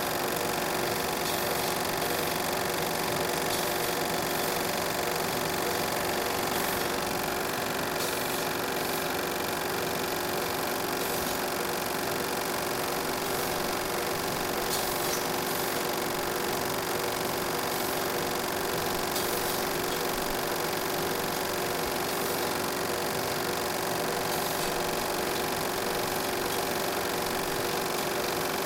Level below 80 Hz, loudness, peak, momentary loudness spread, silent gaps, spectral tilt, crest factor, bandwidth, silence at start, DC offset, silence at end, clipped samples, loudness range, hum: -54 dBFS; -29 LUFS; -14 dBFS; 1 LU; none; -2.5 dB/octave; 16 dB; 17 kHz; 0 s; under 0.1%; 0 s; under 0.1%; 1 LU; none